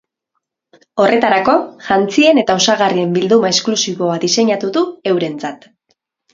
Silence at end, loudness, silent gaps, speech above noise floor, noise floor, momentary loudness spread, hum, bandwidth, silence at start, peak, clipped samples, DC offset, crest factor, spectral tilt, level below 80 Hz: 0.8 s; -14 LUFS; none; 59 dB; -73 dBFS; 7 LU; none; 7.8 kHz; 0.95 s; 0 dBFS; under 0.1%; under 0.1%; 14 dB; -3.5 dB/octave; -58 dBFS